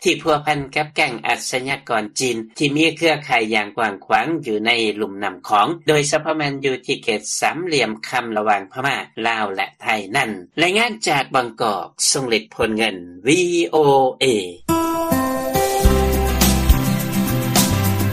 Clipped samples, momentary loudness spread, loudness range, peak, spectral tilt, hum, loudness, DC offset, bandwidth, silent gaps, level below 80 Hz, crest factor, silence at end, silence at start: under 0.1%; 6 LU; 3 LU; 0 dBFS; -4 dB/octave; none; -19 LUFS; under 0.1%; 15 kHz; none; -30 dBFS; 18 dB; 0 s; 0 s